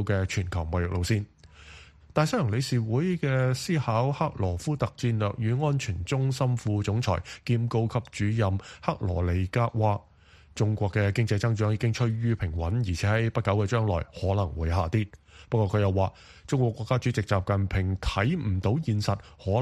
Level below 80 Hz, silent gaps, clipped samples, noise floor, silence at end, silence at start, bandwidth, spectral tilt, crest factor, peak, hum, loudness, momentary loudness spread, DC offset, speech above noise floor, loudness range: -44 dBFS; none; under 0.1%; -50 dBFS; 0 s; 0 s; 12.5 kHz; -7 dB/octave; 18 dB; -8 dBFS; none; -27 LUFS; 4 LU; under 0.1%; 24 dB; 1 LU